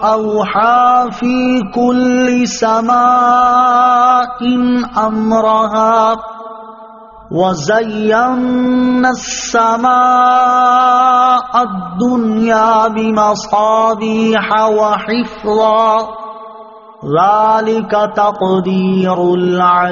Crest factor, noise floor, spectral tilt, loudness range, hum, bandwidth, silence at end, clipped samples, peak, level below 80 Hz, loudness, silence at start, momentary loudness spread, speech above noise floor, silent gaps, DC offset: 12 dB; -35 dBFS; -4 dB/octave; 4 LU; none; 7.4 kHz; 0 s; under 0.1%; 0 dBFS; -48 dBFS; -11 LUFS; 0 s; 7 LU; 24 dB; none; under 0.1%